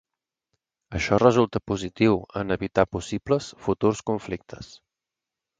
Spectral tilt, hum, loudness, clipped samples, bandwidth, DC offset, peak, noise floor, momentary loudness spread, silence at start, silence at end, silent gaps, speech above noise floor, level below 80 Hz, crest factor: -6 dB/octave; none; -24 LUFS; under 0.1%; 9.4 kHz; under 0.1%; -4 dBFS; -88 dBFS; 16 LU; 0.9 s; 0.95 s; none; 64 dB; -48 dBFS; 22 dB